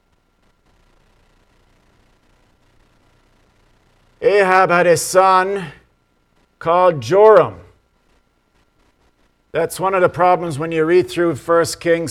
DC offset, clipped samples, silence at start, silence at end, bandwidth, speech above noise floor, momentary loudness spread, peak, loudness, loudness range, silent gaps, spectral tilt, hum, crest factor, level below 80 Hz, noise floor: under 0.1%; under 0.1%; 4.2 s; 0 s; 15.5 kHz; 46 dB; 10 LU; 0 dBFS; -15 LUFS; 6 LU; none; -5 dB/octave; none; 18 dB; -54 dBFS; -60 dBFS